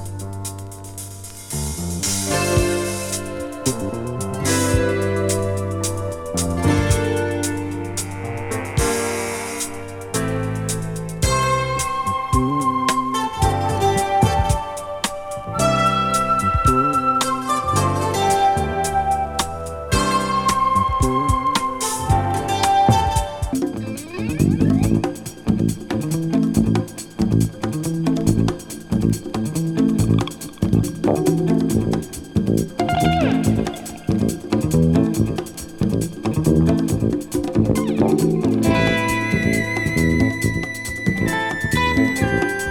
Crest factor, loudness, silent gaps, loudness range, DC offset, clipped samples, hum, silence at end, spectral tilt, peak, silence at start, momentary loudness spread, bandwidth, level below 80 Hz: 18 dB; -20 LUFS; none; 4 LU; under 0.1%; under 0.1%; none; 0 s; -5 dB/octave; -2 dBFS; 0 s; 9 LU; 18.5 kHz; -34 dBFS